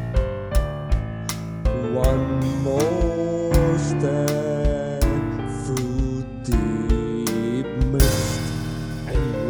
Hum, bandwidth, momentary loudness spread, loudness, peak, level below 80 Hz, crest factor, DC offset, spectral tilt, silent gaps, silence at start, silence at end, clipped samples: none; over 20 kHz; 7 LU; -23 LUFS; -4 dBFS; -26 dBFS; 18 dB; under 0.1%; -6.5 dB/octave; none; 0 s; 0 s; under 0.1%